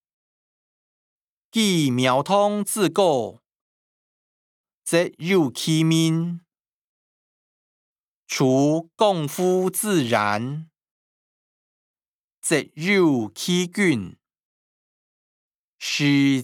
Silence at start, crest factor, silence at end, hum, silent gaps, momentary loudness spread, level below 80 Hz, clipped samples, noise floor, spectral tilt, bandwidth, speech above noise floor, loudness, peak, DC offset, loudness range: 1.55 s; 18 dB; 0 s; none; 3.56-4.64 s, 4.74-4.82 s, 6.73-7.96 s, 8.08-8.23 s, 10.91-11.94 s, 12.08-12.42 s, 14.43-15.78 s; 11 LU; -76 dBFS; under 0.1%; -56 dBFS; -5 dB/octave; 18 kHz; 35 dB; -21 LUFS; -6 dBFS; under 0.1%; 3 LU